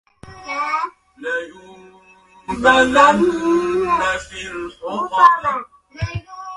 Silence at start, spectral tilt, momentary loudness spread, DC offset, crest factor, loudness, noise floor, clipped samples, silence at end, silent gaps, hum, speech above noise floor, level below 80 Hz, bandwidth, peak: 0.25 s; -4.5 dB/octave; 17 LU; under 0.1%; 18 dB; -17 LUFS; -49 dBFS; under 0.1%; 0 s; none; none; 34 dB; -44 dBFS; 11.5 kHz; 0 dBFS